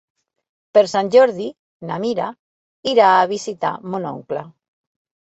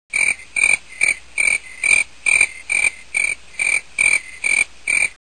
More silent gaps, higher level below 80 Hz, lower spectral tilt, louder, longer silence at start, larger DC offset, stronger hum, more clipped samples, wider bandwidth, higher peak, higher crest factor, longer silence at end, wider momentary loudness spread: first, 1.59-1.80 s, 2.39-2.83 s vs none; second, -66 dBFS vs -52 dBFS; first, -4.5 dB/octave vs 1.5 dB/octave; about the same, -18 LUFS vs -16 LUFS; first, 0.75 s vs 0.15 s; second, under 0.1% vs 0.7%; neither; neither; second, 8.2 kHz vs 11 kHz; about the same, -2 dBFS vs 0 dBFS; about the same, 18 dB vs 18 dB; first, 0.9 s vs 0.1 s; first, 15 LU vs 4 LU